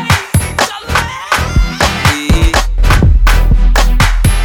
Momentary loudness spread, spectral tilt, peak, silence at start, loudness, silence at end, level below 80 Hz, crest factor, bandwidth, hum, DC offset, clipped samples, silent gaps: 5 LU; -4.5 dB/octave; 0 dBFS; 0 s; -12 LUFS; 0 s; -12 dBFS; 10 dB; 17.5 kHz; none; under 0.1%; under 0.1%; none